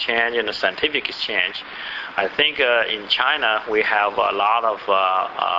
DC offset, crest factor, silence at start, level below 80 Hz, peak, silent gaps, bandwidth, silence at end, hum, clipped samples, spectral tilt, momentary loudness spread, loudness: under 0.1%; 18 dB; 0 s; -58 dBFS; -2 dBFS; none; 7.8 kHz; 0 s; none; under 0.1%; -3.5 dB/octave; 6 LU; -19 LUFS